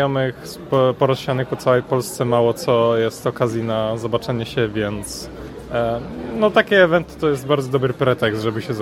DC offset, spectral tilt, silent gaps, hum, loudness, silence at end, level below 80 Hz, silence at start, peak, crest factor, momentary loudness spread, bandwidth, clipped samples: under 0.1%; -6 dB/octave; none; none; -19 LUFS; 0 s; -46 dBFS; 0 s; 0 dBFS; 18 dB; 9 LU; 16 kHz; under 0.1%